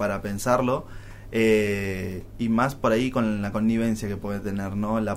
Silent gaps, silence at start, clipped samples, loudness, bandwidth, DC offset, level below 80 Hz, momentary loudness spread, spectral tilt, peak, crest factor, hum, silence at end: none; 0 s; under 0.1%; -25 LUFS; 16 kHz; under 0.1%; -44 dBFS; 9 LU; -6.5 dB/octave; -8 dBFS; 16 dB; none; 0 s